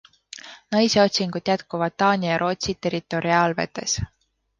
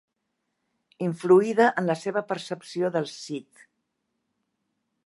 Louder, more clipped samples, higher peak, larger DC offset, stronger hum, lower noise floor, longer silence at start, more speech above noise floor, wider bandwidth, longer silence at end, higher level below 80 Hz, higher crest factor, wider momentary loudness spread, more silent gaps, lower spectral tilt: first, -22 LUFS vs -25 LUFS; neither; about the same, -6 dBFS vs -6 dBFS; neither; neither; second, -43 dBFS vs -79 dBFS; second, 0.35 s vs 1 s; second, 21 dB vs 55 dB; second, 10 kHz vs 11.5 kHz; second, 0.55 s vs 1.65 s; first, -48 dBFS vs -80 dBFS; about the same, 18 dB vs 20 dB; about the same, 17 LU vs 15 LU; neither; second, -4 dB/octave vs -6 dB/octave